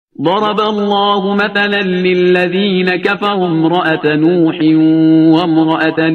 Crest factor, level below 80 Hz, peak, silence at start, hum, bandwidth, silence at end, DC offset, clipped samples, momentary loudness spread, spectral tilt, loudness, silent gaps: 10 dB; -56 dBFS; 0 dBFS; 0.2 s; none; 6.2 kHz; 0 s; under 0.1%; under 0.1%; 5 LU; -7.5 dB/octave; -12 LUFS; none